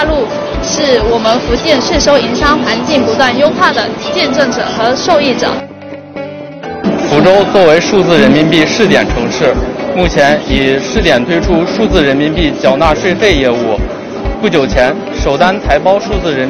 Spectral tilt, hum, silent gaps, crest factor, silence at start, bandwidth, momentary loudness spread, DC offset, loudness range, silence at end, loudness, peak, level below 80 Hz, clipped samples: -4.5 dB/octave; none; none; 10 dB; 0 s; 11 kHz; 9 LU; under 0.1%; 3 LU; 0 s; -10 LUFS; 0 dBFS; -24 dBFS; 0.8%